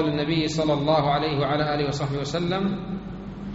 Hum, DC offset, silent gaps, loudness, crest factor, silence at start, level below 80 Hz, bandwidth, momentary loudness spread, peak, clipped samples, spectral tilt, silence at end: none; under 0.1%; none; -24 LUFS; 16 dB; 0 s; -46 dBFS; 8 kHz; 12 LU; -8 dBFS; under 0.1%; -5 dB/octave; 0 s